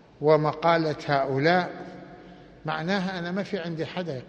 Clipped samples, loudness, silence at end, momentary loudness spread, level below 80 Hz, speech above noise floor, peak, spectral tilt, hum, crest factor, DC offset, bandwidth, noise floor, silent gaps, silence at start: under 0.1%; -25 LUFS; 0 s; 17 LU; -60 dBFS; 23 dB; -6 dBFS; -7 dB/octave; none; 20 dB; under 0.1%; 8.4 kHz; -48 dBFS; none; 0.2 s